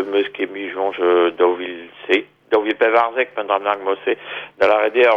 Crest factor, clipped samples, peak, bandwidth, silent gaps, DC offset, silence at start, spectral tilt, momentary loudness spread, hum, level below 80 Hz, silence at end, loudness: 16 dB; under 0.1%; -2 dBFS; 7.4 kHz; none; under 0.1%; 0 s; -5 dB/octave; 10 LU; none; -66 dBFS; 0 s; -18 LUFS